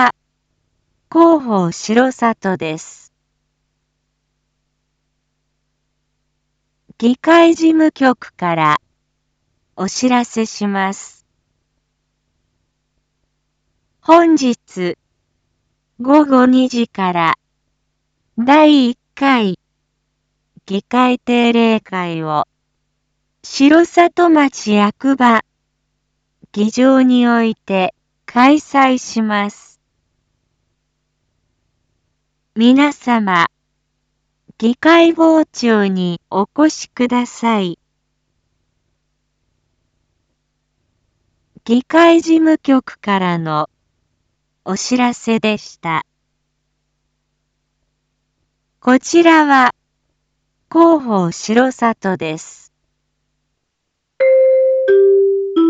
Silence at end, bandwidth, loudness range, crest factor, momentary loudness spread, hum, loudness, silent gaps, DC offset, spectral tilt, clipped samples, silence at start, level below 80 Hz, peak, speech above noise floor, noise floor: 0 s; 8 kHz; 8 LU; 16 dB; 12 LU; none; -14 LUFS; none; under 0.1%; -5 dB/octave; under 0.1%; 0 s; -62 dBFS; 0 dBFS; 60 dB; -73 dBFS